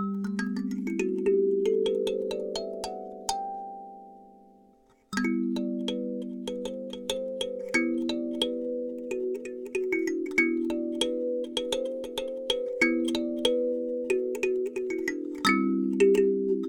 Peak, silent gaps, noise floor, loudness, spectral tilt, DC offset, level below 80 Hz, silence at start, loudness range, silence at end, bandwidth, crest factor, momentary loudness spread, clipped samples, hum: -10 dBFS; none; -61 dBFS; -29 LUFS; -4.5 dB/octave; under 0.1%; -62 dBFS; 0 s; 6 LU; 0 s; 18 kHz; 20 dB; 10 LU; under 0.1%; none